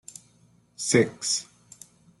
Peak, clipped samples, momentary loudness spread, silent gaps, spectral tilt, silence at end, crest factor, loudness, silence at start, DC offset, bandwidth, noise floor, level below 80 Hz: -6 dBFS; under 0.1%; 25 LU; none; -3.5 dB/octave; 0.75 s; 22 dB; -25 LUFS; 0.8 s; under 0.1%; 12.5 kHz; -61 dBFS; -68 dBFS